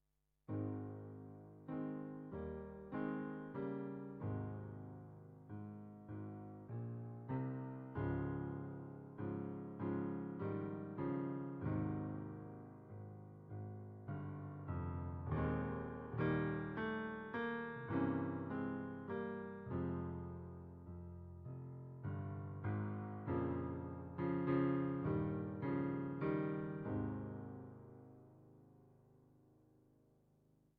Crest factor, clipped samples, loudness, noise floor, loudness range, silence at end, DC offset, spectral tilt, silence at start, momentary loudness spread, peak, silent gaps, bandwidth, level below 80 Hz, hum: 18 dB; under 0.1%; -44 LUFS; -74 dBFS; 8 LU; 1.4 s; under 0.1%; -8.5 dB/octave; 0.5 s; 14 LU; -26 dBFS; none; 4.6 kHz; -64 dBFS; none